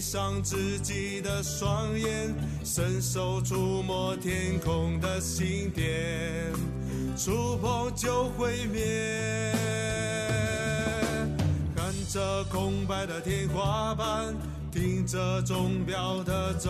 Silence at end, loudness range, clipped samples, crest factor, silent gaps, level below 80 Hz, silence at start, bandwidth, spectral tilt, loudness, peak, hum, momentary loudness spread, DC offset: 0 s; 1 LU; under 0.1%; 14 dB; none; -42 dBFS; 0 s; 14 kHz; -5 dB/octave; -30 LUFS; -14 dBFS; none; 3 LU; under 0.1%